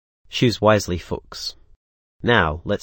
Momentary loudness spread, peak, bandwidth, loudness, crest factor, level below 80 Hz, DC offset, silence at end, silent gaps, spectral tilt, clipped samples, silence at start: 13 LU; 0 dBFS; 17 kHz; -21 LUFS; 22 dB; -42 dBFS; under 0.1%; 0.05 s; 1.76-2.20 s; -5 dB/octave; under 0.1%; 0.3 s